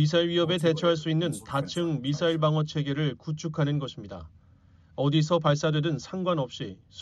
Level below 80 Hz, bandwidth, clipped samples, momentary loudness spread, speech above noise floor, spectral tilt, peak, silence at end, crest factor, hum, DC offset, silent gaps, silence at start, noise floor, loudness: -60 dBFS; 12 kHz; under 0.1%; 13 LU; 30 dB; -6.5 dB/octave; -12 dBFS; 0 s; 16 dB; none; under 0.1%; none; 0 s; -57 dBFS; -27 LUFS